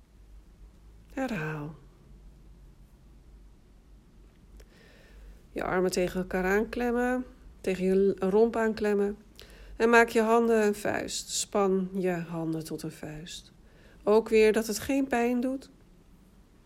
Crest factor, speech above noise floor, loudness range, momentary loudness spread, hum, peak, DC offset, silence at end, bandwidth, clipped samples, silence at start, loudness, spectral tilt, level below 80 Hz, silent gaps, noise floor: 22 dB; 30 dB; 15 LU; 16 LU; none; -8 dBFS; under 0.1%; 1 s; 16 kHz; under 0.1%; 0.35 s; -27 LUFS; -5 dB/octave; -52 dBFS; none; -57 dBFS